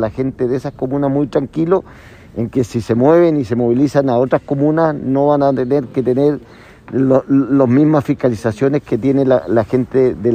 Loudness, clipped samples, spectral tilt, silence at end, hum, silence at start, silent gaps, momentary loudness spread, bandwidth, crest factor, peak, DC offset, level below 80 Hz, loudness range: -15 LUFS; under 0.1%; -8.5 dB/octave; 0 s; none; 0 s; none; 7 LU; 9.6 kHz; 14 dB; 0 dBFS; under 0.1%; -46 dBFS; 2 LU